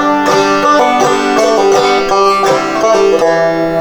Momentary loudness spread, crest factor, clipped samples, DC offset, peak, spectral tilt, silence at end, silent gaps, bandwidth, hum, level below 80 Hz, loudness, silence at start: 2 LU; 10 dB; under 0.1%; under 0.1%; 0 dBFS; -3.5 dB/octave; 0 s; none; 19.5 kHz; none; -42 dBFS; -10 LUFS; 0 s